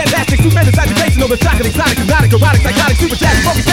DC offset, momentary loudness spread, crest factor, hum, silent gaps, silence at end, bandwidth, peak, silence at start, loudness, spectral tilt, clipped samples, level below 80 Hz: under 0.1%; 3 LU; 10 dB; none; none; 0 s; 17 kHz; 0 dBFS; 0 s; -11 LUFS; -5 dB/octave; under 0.1%; -18 dBFS